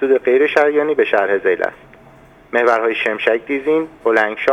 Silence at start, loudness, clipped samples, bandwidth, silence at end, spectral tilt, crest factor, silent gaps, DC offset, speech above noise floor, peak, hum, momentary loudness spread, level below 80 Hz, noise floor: 0 s; -16 LUFS; under 0.1%; 11 kHz; 0 s; -5 dB/octave; 16 dB; none; under 0.1%; 29 dB; 0 dBFS; none; 5 LU; -56 dBFS; -44 dBFS